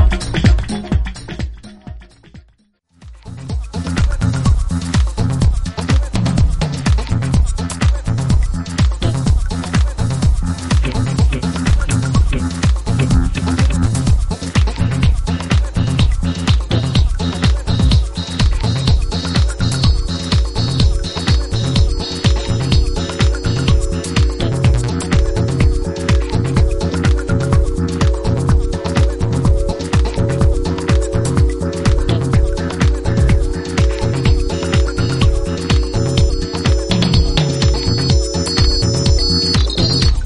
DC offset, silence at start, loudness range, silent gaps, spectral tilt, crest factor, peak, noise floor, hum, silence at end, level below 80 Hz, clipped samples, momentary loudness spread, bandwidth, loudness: under 0.1%; 0 s; 2 LU; none; -5.5 dB/octave; 12 dB; -2 dBFS; -55 dBFS; none; 0 s; -18 dBFS; under 0.1%; 4 LU; 11.5 kHz; -16 LUFS